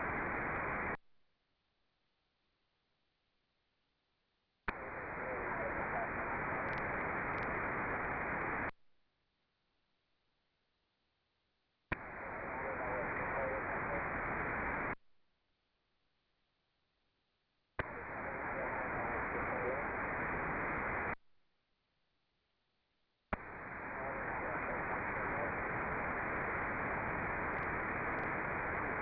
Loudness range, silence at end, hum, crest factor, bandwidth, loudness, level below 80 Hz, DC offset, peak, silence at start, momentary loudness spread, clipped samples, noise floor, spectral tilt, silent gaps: 11 LU; 0 s; none; 18 dB; 5 kHz; -39 LUFS; -58 dBFS; under 0.1%; -24 dBFS; 0 s; 6 LU; under 0.1%; -82 dBFS; -5.5 dB/octave; none